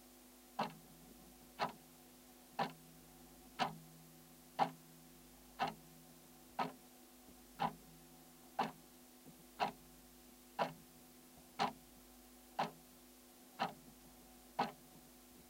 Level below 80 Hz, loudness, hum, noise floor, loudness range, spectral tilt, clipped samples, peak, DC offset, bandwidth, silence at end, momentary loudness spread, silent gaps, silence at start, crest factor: -74 dBFS; -44 LUFS; none; -62 dBFS; 2 LU; -4 dB/octave; under 0.1%; -20 dBFS; under 0.1%; 16 kHz; 0 s; 18 LU; none; 0 s; 28 dB